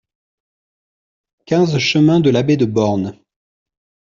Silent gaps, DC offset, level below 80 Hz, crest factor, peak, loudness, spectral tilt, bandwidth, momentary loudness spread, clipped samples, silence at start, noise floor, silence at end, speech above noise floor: none; under 0.1%; -56 dBFS; 14 dB; -2 dBFS; -15 LUFS; -6.5 dB/octave; 7.4 kHz; 8 LU; under 0.1%; 1.5 s; under -90 dBFS; 1 s; over 76 dB